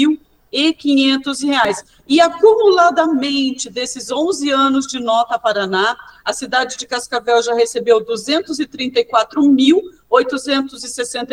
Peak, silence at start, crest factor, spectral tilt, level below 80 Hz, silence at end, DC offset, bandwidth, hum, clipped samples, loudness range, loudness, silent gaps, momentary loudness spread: 0 dBFS; 0 s; 16 dB; -2.5 dB/octave; -56 dBFS; 0 s; under 0.1%; 12.5 kHz; none; under 0.1%; 3 LU; -16 LUFS; none; 11 LU